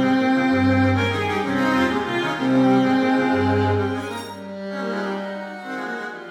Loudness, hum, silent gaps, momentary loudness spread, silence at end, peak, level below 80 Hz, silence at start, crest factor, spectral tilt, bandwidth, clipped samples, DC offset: -21 LUFS; none; none; 13 LU; 0 s; -6 dBFS; -58 dBFS; 0 s; 14 dB; -6.5 dB/octave; 12 kHz; under 0.1%; under 0.1%